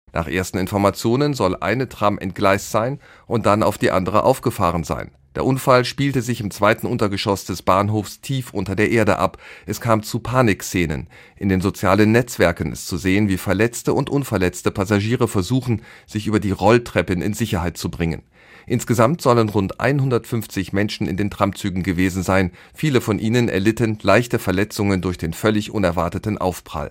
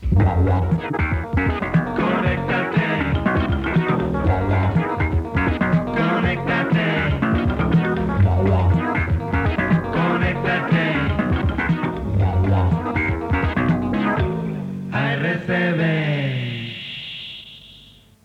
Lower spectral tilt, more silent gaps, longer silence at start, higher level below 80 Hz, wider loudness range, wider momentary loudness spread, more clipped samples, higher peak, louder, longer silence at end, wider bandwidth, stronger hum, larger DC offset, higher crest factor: second, -6 dB/octave vs -8.5 dB/octave; neither; first, 0.15 s vs 0 s; second, -46 dBFS vs -34 dBFS; about the same, 2 LU vs 2 LU; first, 9 LU vs 5 LU; neither; about the same, -2 dBFS vs -4 dBFS; about the same, -20 LUFS vs -20 LUFS; second, 0 s vs 0.45 s; first, 16.5 kHz vs 6.4 kHz; neither; neither; about the same, 18 dB vs 14 dB